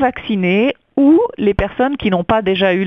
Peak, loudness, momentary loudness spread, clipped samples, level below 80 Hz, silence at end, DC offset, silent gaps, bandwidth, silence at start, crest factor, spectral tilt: 0 dBFS; -15 LUFS; 6 LU; under 0.1%; -36 dBFS; 0 s; 0.2%; none; 5.8 kHz; 0 s; 14 dB; -8.5 dB/octave